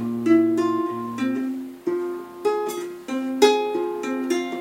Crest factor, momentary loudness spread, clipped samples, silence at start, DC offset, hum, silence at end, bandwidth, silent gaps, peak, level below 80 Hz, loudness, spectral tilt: 20 dB; 11 LU; under 0.1%; 0 s; under 0.1%; none; 0 s; 16.5 kHz; none; -2 dBFS; -72 dBFS; -23 LUFS; -4.5 dB/octave